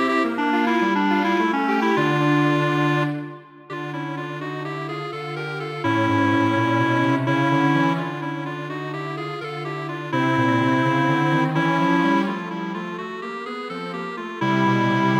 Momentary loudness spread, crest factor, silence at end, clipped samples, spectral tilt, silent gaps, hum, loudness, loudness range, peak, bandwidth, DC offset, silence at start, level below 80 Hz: 11 LU; 14 dB; 0 s; under 0.1%; -7 dB/octave; none; none; -22 LUFS; 4 LU; -8 dBFS; 11.5 kHz; under 0.1%; 0 s; -70 dBFS